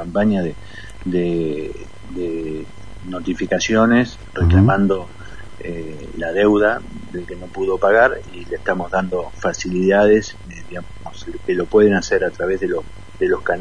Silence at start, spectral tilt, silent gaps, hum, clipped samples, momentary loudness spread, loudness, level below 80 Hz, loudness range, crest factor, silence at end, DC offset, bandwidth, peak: 0 s; -6.5 dB/octave; none; none; under 0.1%; 19 LU; -18 LUFS; -38 dBFS; 3 LU; 18 dB; 0 s; 2%; 10.5 kHz; -2 dBFS